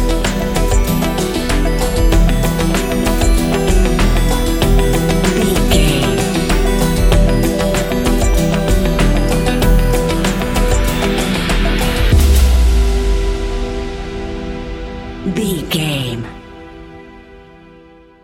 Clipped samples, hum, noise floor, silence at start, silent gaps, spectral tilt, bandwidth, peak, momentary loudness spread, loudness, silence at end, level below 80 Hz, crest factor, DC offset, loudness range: under 0.1%; none; -42 dBFS; 0 s; none; -5 dB/octave; 16.5 kHz; 0 dBFS; 11 LU; -15 LUFS; 0.85 s; -16 dBFS; 14 dB; under 0.1%; 7 LU